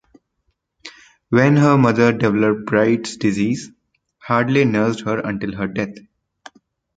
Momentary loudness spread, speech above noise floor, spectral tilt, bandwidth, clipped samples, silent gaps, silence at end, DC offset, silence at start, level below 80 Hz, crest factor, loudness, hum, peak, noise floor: 13 LU; 53 dB; -7 dB/octave; 9.2 kHz; under 0.1%; none; 1 s; under 0.1%; 0.85 s; -54 dBFS; 18 dB; -18 LUFS; none; -2 dBFS; -70 dBFS